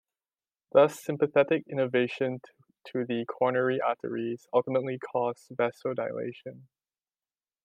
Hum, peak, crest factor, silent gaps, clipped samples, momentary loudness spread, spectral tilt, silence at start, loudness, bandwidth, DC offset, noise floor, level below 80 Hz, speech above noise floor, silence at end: none; -8 dBFS; 22 dB; none; under 0.1%; 11 LU; -6.5 dB/octave; 0.75 s; -29 LUFS; 15 kHz; under 0.1%; under -90 dBFS; -82 dBFS; over 62 dB; 1.05 s